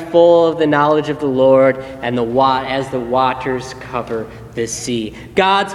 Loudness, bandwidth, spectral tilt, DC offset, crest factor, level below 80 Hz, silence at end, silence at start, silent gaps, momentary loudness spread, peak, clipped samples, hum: -16 LUFS; 12 kHz; -5 dB/octave; under 0.1%; 16 dB; -46 dBFS; 0 s; 0 s; none; 13 LU; 0 dBFS; under 0.1%; none